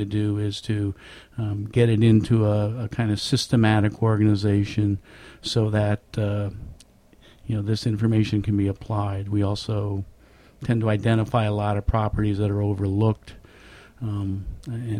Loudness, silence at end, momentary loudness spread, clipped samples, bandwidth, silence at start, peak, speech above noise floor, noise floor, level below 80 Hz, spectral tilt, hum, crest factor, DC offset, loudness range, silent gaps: -24 LUFS; 0 s; 13 LU; under 0.1%; 11 kHz; 0 s; -6 dBFS; 30 dB; -53 dBFS; -42 dBFS; -7 dB/octave; none; 16 dB; under 0.1%; 5 LU; none